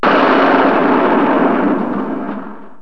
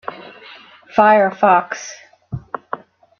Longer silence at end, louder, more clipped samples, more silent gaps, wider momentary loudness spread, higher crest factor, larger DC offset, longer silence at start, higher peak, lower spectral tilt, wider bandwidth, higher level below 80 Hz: second, 0.15 s vs 0.45 s; about the same, -13 LUFS vs -14 LUFS; neither; neither; second, 14 LU vs 21 LU; about the same, 14 dB vs 16 dB; first, 3% vs under 0.1%; about the same, 0 s vs 0.1 s; about the same, 0 dBFS vs -2 dBFS; first, -7.5 dB/octave vs -5 dB/octave; second, 6.2 kHz vs 7 kHz; about the same, -50 dBFS vs -54 dBFS